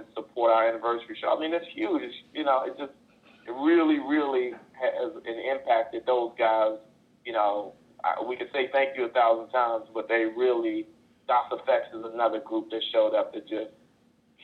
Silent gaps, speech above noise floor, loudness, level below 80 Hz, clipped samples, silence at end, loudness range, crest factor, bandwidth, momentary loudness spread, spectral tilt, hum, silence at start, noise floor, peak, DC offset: none; 37 dB; -27 LUFS; -76 dBFS; under 0.1%; 0.75 s; 2 LU; 18 dB; 5 kHz; 12 LU; -6 dB/octave; none; 0 s; -64 dBFS; -10 dBFS; under 0.1%